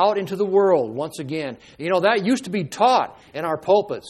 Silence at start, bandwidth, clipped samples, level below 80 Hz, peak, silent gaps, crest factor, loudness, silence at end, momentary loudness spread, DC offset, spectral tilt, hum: 0 s; 14 kHz; under 0.1%; -64 dBFS; -4 dBFS; none; 16 dB; -21 LUFS; 0 s; 11 LU; under 0.1%; -5.5 dB/octave; none